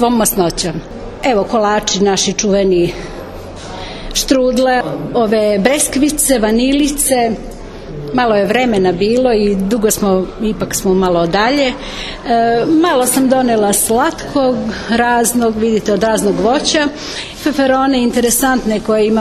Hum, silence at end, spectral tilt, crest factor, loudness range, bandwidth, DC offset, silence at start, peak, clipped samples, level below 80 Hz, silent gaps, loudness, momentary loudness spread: none; 0 s; -4 dB/octave; 14 dB; 2 LU; 13.5 kHz; under 0.1%; 0 s; 0 dBFS; under 0.1%; -34 dBFS; none; -13 LUFS; 11 LU